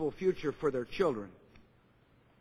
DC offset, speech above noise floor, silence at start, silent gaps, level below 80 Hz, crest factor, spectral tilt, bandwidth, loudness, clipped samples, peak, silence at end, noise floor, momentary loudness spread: under 0.1%; 32 dB; 0 s; none; -60 dBFS; 20 dB; -7 dB/octave; 11 kHz; -34 LUFS; under 0.1%; -16 dBFS; 0.8 s; -66 dBFS; 8 LU